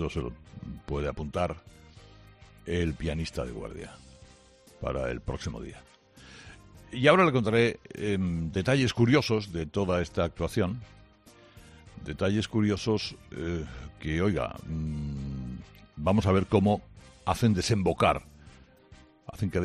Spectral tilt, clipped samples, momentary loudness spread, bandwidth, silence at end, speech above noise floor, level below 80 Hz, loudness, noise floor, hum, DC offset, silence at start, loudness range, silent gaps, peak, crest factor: -6 dB/octave; under 0.1%; 19 LU; 13.5 kHz; 0 s; 28 dB; -48 dBFS; -28 LUFS; -56 dBFS; none; under 0.1%; 0 s; 10 LU; none; -6 dBFS; 24 dB